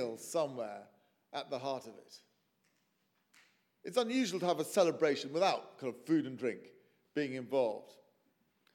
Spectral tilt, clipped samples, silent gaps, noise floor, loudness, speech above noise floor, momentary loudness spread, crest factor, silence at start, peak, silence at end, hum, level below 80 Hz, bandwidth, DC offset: -4.5 dB/octave; under 0.1%; none; -78 dBFS; -36 LUFS; 43 dB; 15 LU; 20 dB; 0 s; -16 dBFS; 0.85 s; none; under -90 dBFS; 17 kHz; under 0.1%